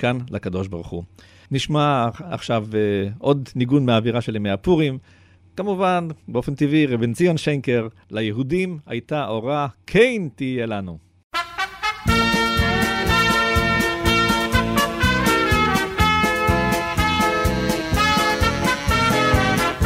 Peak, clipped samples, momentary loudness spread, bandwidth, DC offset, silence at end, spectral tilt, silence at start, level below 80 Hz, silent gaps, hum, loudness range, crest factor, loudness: -2 dBFS; under 0.1%; 10 LU; 16 kHz; under 0.1%; 0 s; -5 dB/octave; 0 s; -34 dBFS; 11.24-11.30 s; none; 5 LU; 18 dB; -20 LUFS